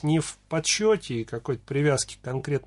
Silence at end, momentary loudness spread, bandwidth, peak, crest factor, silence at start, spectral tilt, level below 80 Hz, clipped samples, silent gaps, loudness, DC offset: 0.05 s; 9 LU; 11.5 kHz; -10 dBFS; 16 dB; 0.05 s; -4.5 dB/octave; -54 dBFS; under 0.1%; none; -26 LUFS; under 0.1%